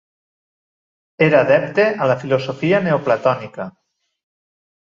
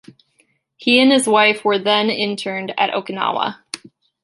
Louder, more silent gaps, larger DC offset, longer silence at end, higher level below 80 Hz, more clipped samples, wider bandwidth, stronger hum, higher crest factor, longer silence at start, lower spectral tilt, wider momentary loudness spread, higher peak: about the same, -17 LUFS vs -17 LUFS; neither; neither; first, 1.15 s vs 0.45 s; first, -60 dBFS vs -70 dBFS; neither; second, 7.4 kHz vs 11.5 kHz; neither; about the same, 18 dB vs 18 dB; first, 1.2 s vs 0.8 s; first, -7.5 dB/octave vs -3 dB/octave; about the same, 12 LU vs 12 LU; about the same, -2 dBFS vs -2 dBFS